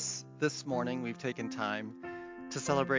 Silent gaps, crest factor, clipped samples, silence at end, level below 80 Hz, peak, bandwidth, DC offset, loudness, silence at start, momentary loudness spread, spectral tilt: none; 20 dB; under 0.1%; 0 s; -72 dBFS; -14 dBFS; 7.8 kHz; under 0.1%; -36 LUFS; 0 s; 11 LU; -4 dB/octave